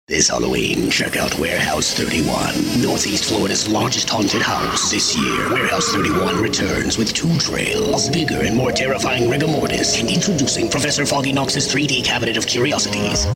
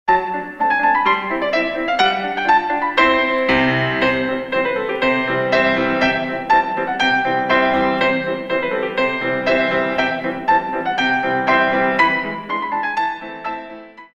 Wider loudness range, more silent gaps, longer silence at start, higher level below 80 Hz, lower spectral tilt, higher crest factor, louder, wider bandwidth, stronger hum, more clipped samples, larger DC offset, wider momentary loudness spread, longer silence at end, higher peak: about the same, 1 LU vs 2 LU; neither; about the same, 0.1 s vs 0.05 s; first, -38 dBFS vs -48 dBFS; second, -3.5 dB/octave vs -5.5 dB/octave; about the same, 16 dB vs 18 dB; about the same, -17 LUFS vs -17 LUFS; first, 16.5 kHz vs 8.6 kHz; neither; neither; neither; second, 2 LU vs 6 LU; about the same, 0 s vs 0.1 s; about the same, -2 dBFS vs 0 dBFS